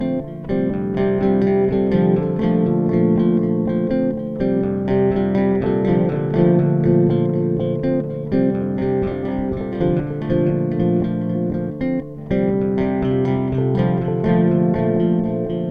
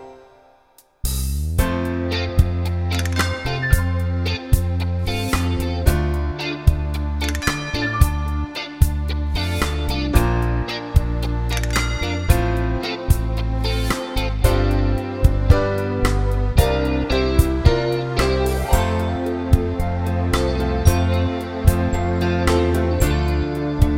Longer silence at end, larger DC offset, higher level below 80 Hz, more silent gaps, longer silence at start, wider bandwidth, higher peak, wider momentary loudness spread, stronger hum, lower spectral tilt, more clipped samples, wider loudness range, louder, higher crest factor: about the same, 0 s vs 0 s; first, 0.1% vs under 0.1%; second, -40 dBFS vs -22 dBFS; neither; about the same, 0 s vs 0 s; second, 4.9 kHz vs 17 kHz; second, -4 dBFS vs 0 dBFS; about the same, 6 LU vs 5 LU; neither; first, -11 dB/octave vs -6 dB/octave; neither; about the same, 3 LU vs 3 LU; about the same, -19 LUFS vs -21 LUFS; about the same, 14 dB vs 18 dB